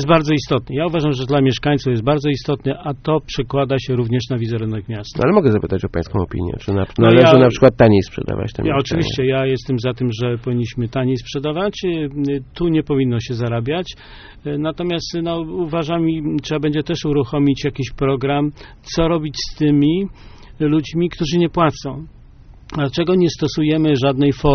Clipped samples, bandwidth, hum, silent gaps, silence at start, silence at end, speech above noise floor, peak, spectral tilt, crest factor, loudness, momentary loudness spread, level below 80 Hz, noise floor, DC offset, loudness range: under 0.1%; 6.6 kHz; none; none; 0 s; 0 s; 25 dB; 0 dBFS; -6 dB/octave; 18 dB; -18 LUFS; 9 LU; -38 dBFS; -42 dBFS; under 0.1%; 7 LU